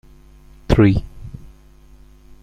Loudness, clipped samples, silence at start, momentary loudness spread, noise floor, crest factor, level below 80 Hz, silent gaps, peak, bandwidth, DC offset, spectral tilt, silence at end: -16 LUFS; under 0.1%; 0.7 s; 24 LU; -46 dBFS; 18 dB; -30 dBFS; none; -2 dBFS; 9.6 kHz; under 0.1%; -8.5 dB/octave; 0.95 s